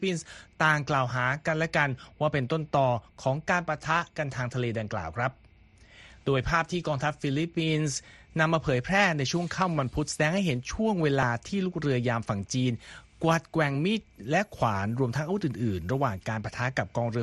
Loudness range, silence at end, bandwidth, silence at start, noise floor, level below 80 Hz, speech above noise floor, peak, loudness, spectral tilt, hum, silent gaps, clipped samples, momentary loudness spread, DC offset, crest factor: 4 LU; 0 s; 12.5 kHz; 0 s; -56 dBFS; -52 dBFS; 28 dB; -8 dBFS; -28 LUFS; -5.5 dB/octave; none; none; under 0.1%; 6 LU; under 0.1%; 20 dB